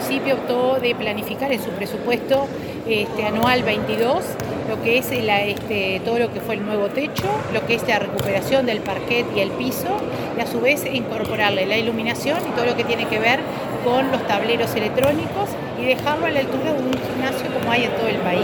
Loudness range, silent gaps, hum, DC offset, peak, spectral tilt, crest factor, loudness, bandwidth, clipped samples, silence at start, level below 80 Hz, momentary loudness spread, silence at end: 1 LU; none; none; under 0.1%; -2 dBFS; -5 dB/octave; 18 dB; -21 LUFS; 19 kHz; under 0.1%; 0 s; -50 dBFS; 5 LU; 0 s